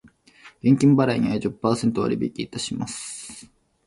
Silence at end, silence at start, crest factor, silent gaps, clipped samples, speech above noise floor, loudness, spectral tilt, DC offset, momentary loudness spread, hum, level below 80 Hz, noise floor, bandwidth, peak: 0.45 s; 0.45 s; 18 dB; none; under 0.1%; 30 dB; -22 LUFS; -6 dB/octave; under 0.1%; 16 LU; none; -54 dBFS; -51 dBFS; 11.5 kHz; -6 dBFS